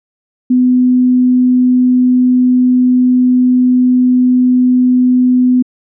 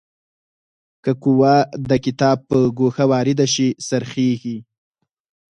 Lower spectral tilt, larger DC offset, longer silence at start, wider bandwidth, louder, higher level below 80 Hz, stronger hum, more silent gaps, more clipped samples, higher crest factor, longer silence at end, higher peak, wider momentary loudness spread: first, -17.5 dB/octave vs -6 dB/octave; neither; second, 0.5 s vs 1.05 s; second, 0.4 kHz vs 10 kHz; first, -10 LUFS vs -18 LUFS; second, -76 dBFS vs -54 dBFS; neither; neither; neither; second, 4 dB vs 16 dB; second, 0.35 s vs 0.95 s; second, -6 dBFS vs -2 dBFS; second, 1 LU vs 9 LU